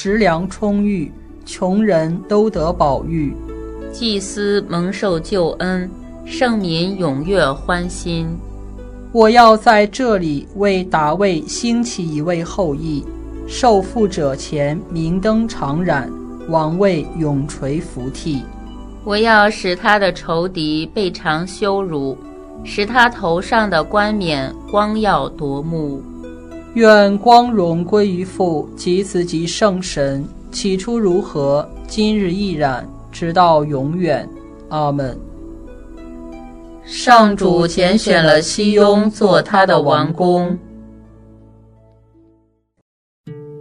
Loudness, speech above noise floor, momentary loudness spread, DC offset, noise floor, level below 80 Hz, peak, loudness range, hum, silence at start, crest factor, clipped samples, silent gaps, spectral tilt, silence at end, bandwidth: -16 LUFS; 42 dB; 19 LU; under 0.1%; -58 dBFS; -36 dBFS; 0 dBFS; 6 LU; none; 0 s; 16 dB; under 0.1%; 42.82-43.24 s; -5.5 dB/octave; 0 s; 11 kHz